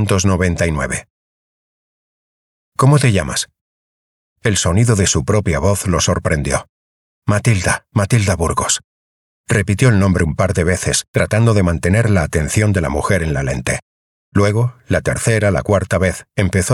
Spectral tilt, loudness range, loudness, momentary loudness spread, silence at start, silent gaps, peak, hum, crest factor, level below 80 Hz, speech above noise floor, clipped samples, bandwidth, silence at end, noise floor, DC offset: -5 dB/octave; 3 LU; -16 LUFS; 7 LU; 0 s; 1.10-2.72 s, 3.61-4.36 s, 6.69-7.22 s, 8.84-9.44 s, 11.08-11.14 s, 13.82-14.32 s; -2 dBFS; none; 14 dB; -36 dBFS; over 75 dB; under 0.1%; 15 kHz; 0 s; under -90 dBFS; under 0.1%